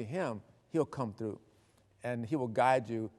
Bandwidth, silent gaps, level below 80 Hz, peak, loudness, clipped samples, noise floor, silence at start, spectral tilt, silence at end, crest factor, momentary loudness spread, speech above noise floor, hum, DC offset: 12 kHz; none; -76 dBFS; -14 dBFS; -34 LUFS; under 0.1%; -67 dBFS; 0 s; -7 dB/octave; 0.1 s; 22 dB; 14 LU; 33 dB; none; under 0.1%